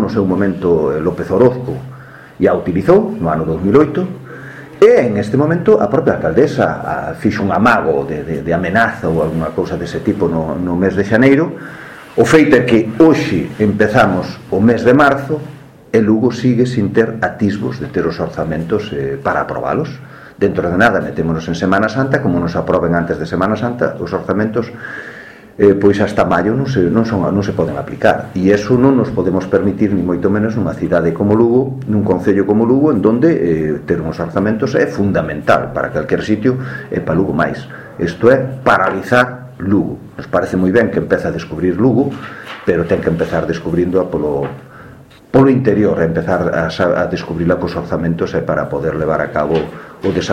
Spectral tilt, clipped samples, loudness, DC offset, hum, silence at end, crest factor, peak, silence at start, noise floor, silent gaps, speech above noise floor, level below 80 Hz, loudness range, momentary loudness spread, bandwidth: -7.5 dB/octave; under 0.1%; -14 LUFS; under 0.1%; none; 0 s; 14 dB; 0 dBFS; 0 s; -39 dBFS; none; 25 dB; -40 dBFS; 4 LU; 10 LU; 14 kHz